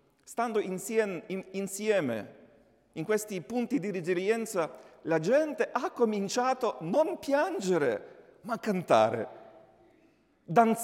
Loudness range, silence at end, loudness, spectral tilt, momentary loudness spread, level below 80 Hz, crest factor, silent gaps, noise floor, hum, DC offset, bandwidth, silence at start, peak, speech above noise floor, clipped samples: 4 LU; 0 s; -30 LUFS; -5 dB/octave; 12 LU; -76 dBFS; 20 dB; none; -65 dBFS; none; under 0.1%; 16.5 kHz; 0.3 s; -10 dBFS; 36 dB; under 0.1%